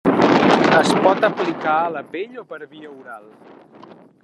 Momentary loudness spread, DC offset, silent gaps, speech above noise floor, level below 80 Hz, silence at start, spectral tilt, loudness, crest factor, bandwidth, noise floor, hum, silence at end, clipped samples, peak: 24 LU; under 0.1%; none; 23 dB; -62 dBFS; 0.05 s; -5.5 dB/octave; -16 LUFS; 18 dB; 12 kHz; -44 dBFS; none; 1.05 s; under 0.1%; 0 dBFS